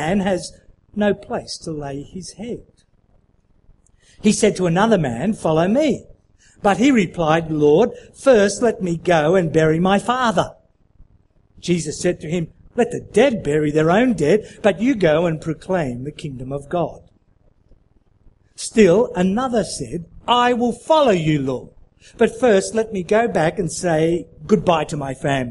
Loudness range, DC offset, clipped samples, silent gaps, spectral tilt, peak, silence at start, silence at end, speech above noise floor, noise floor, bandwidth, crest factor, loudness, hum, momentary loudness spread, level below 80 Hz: 8 LU; under 0.1%; under 0.1%; none; -5.5 dB/octave; 0 dBFS; 0 s; 0 s; 39 dB; -57 dBFS; 11.5 kHz; 18 dB; -18 LUFS; none; 13 LU; -46 dBFS